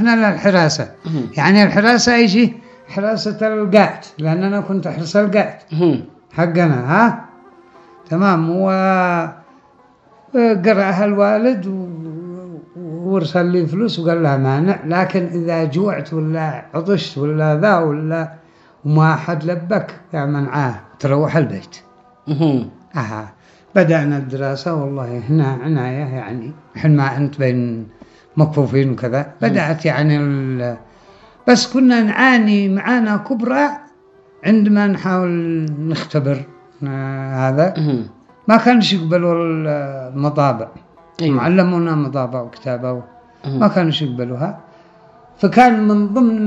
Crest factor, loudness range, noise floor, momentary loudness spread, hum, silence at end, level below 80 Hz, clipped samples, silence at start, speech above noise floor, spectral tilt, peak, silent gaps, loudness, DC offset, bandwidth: 16 dB; 5 LU; -50 dBFS; 13 LU; none; 0 s; -58 dBFS; under 0.1%; 0 s; 35 dB; -6.5 dB/octave; 0 dBFS; none; -16 LUFS; under 0.1%; 8 kHz